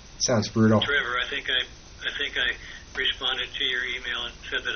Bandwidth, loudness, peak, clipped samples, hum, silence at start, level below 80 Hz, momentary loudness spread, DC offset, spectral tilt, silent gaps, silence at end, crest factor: 6.6 kHz; -25 LUFS; -8 dBFS; under 0.1%; none; 0 s; -48 dBFS; 10 LU; under 0.1%; -2.5 dB/octave; none; 0 s; 18 dB